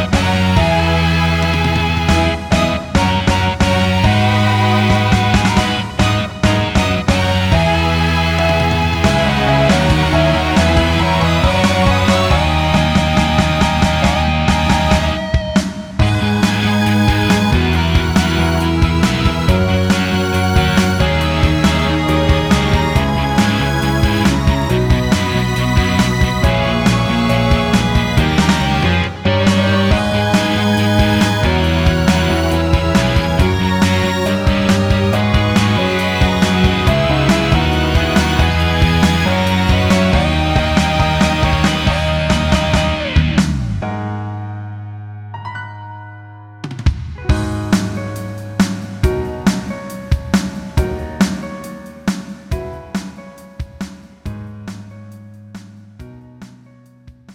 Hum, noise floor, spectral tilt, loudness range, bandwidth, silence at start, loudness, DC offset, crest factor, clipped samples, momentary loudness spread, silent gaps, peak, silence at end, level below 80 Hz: none; -44 dBFS; -5.5 dB/octave; 9 LU; 19 kHz; 0 s; -14 LUFS; under 0.1%; 14 dB; under 0.1%; 12 LU; none; 0 dBFS; 0 s; -24 dBFS